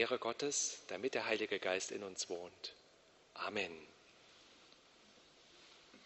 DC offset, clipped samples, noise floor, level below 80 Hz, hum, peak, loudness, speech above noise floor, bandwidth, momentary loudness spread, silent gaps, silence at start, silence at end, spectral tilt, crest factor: under 0.1%; under 0.1%; -67 dBFS; -82 dBFS; none; -20 dBFS; -40 LUFS; 27 dB; 8.2 kHz; 24 LU; none; 0 s; 0 s; -1.5 dB/octave; 24 dB